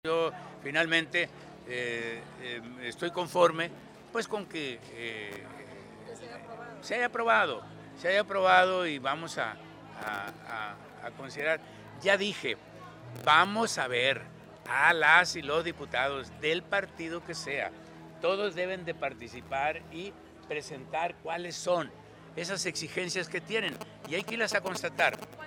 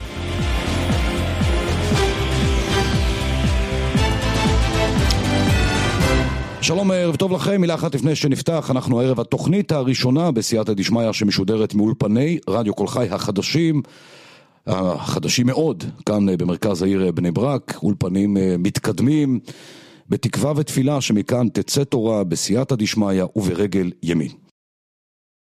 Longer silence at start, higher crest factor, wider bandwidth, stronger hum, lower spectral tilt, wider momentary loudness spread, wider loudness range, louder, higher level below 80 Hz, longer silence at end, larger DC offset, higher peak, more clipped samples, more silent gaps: about the same, 0.05 s vs 0 s; first, 24 dB vs 16 dB; first, 18.5 kHz vs 15.5 kHz; neither; second, -3 dB/octave vs -5.5 dB/octave; first, 20 LU vs 4 LU; first, 9 LU vs 2 LU; second, -30 LUFS vs -20 LUFS; second, -68 dBFS vs -30 dBFS; second, 0 s vs 1.15 s; neither; second, -6 dBFS vs -2 dBFS; neither; neither